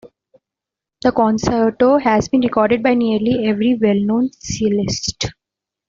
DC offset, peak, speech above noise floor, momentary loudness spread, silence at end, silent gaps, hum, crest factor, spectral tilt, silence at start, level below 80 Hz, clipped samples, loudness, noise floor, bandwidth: under 0.1%; -2 dBFS; 70 dB; 6 LU; 0.55 s; none; none; 16 dB; -5.5 dB/octave; 0.05 s; -44 dBFS; under 0.1%; -17 LUFS; -86 dBFS; 7.6 kHz